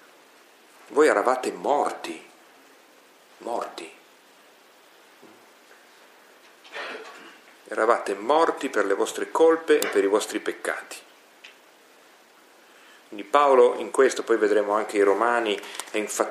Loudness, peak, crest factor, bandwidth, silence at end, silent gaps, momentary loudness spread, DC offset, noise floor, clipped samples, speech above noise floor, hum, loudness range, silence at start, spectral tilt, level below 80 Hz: -23 LUFS; -4 dBFS; 22 dB; 15.5 kHz; 0 s; none; 20 LU; under 0.1%; -54 dBFS; under 0.1%; 32 dB; none; 18 LU; 0.9 s; -2.5 dB/octave; -86 dBFS